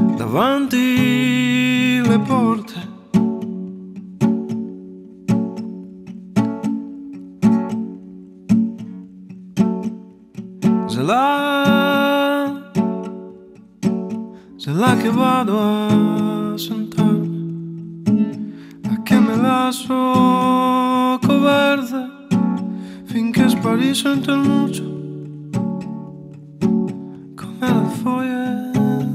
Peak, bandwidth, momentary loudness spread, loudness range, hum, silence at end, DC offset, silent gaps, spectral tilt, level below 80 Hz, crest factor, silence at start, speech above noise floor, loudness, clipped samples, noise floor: -4 dBFS; 16 kHz; 18 LU; 6 LU; none; 0 s; under 0.1%; none; -6 dB/octave; -56 dBFS; 14 dB; 0 s; 26 dB; -18 LUFS; under 0.1%; -42 dBFS